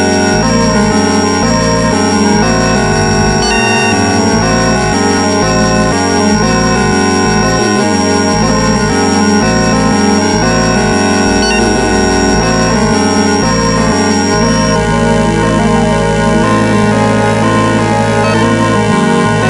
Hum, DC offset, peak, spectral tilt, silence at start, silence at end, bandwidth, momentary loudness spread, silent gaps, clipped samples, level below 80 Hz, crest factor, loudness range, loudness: none; under 0.1%; 0 dBFS; -4.5 dB/octave; 0 s; 0 s; 11.5 kHz; 1 LU; none; under 0.1%; -26 dBFS; 10 dB; 0 LU; -10 LUFS